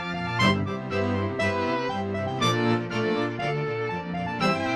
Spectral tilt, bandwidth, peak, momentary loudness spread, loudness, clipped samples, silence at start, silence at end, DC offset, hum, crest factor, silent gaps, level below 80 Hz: -5.5 dB/octave; 12.5 kHz; -8 dBFS; 6 LU; -26 LUFS; under 0.1%; 0 s; 0 s; under 0.1%; none; 18 dB; none; -56 dBFS